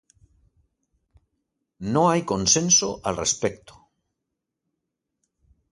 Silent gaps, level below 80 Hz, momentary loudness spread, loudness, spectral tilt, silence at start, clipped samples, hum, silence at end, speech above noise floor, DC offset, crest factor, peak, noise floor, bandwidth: none; -54 dBFS; 11 LU; -21 LUFS; -3 dB/octave; 1.8 s; under 0.1%; none; 2.15 s; 60 dB; under 0.1%; 22 dB; -6 dBFS; -82 dBFS; 11.5 kHz